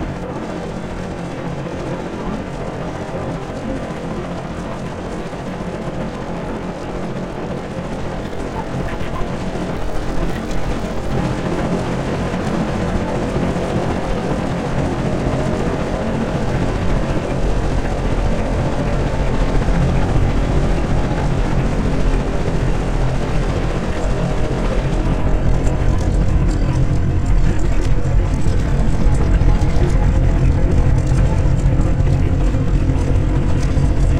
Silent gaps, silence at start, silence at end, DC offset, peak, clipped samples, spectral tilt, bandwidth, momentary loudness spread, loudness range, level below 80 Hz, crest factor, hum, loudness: none; 0 s; 0 s; under 0.1%; -2 dBFS; under 0.1%; -7 dB/octave; 10 kHz; 9 LU; 8 LU; -20 dBFS; 16 dB; none; -20 LUFS